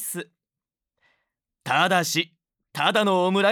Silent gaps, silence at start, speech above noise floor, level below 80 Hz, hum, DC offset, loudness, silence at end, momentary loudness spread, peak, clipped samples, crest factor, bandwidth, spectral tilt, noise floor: none; 0 s; 68 dB; -84 dBFS; none; under 0.1%; -22 LUFS; 0 s; 18 LU; -8 dBFS; under 0.1%; 18 dB; 19.5 kHz; -3.5 dB/octave; -89 dBFS